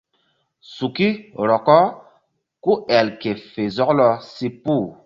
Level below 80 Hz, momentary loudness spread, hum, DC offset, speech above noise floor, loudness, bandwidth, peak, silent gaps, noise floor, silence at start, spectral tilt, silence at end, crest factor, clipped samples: -60 dBFS; 12 LU; none; under 0.1%; 48 dB; -19 LUFS; 7.2 kHz; 0 dBFS; none; -67 dBFS; 0.7 s; -7 dB/octave; 0.15 s; 20 dB; under 0.1%